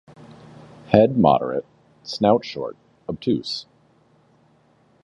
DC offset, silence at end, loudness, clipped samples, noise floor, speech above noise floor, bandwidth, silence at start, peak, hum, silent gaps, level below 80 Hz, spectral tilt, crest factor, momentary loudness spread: under 0.1%; 1.4 s; -21 LUFS; under 0.1%; -59 dBFS; 39 dB; 10.5 kHz; 0.9 s; 0 dBFS; none; none; -54 dBFS; -7 dB/octave; 22 dB; 17 LU